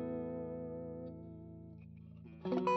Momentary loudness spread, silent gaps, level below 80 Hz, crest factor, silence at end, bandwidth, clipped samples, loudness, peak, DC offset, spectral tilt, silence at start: 15 LU; none; -66 dBFS; 20 dB; 0 s; 7.6 kHz; under 0.1%; -45 LUFS; -22 dBFS; under 0.1%; -6.5 dB/octave; 0 s